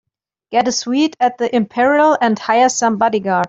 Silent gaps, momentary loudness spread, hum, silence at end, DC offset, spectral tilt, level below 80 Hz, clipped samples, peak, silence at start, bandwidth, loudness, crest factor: none; 5 LU; none; 0 s; under 0.1%; -3.5 dB/octave; -62 dBFS; under 0.1%; -2 dBFS; 0.5 s; 8 kHz; -15 LUFS; 12 dB